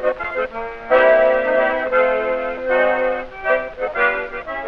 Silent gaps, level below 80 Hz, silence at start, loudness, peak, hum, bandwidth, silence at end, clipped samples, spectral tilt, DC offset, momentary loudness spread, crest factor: none; -44 dBFS; 0 s; -18 LUFS; -2 dBFS; none; 5.4 kHz; 0 s; under 0.1%; -5.5 dB/octave; 0.3%; 11 LU; 16 dB